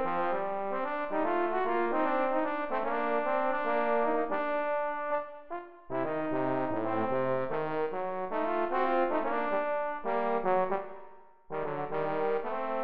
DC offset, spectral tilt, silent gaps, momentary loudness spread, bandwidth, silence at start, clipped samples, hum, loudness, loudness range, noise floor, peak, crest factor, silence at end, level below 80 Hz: 1%; -4.5 dB/octave; none; 6 LU; 5.2 kHz; 0 s; under 0.1%; none; -31 LUFS; 3 LU; -53 dBFS; -16 dBFS; 14 dB; 0 s; -64 dBFS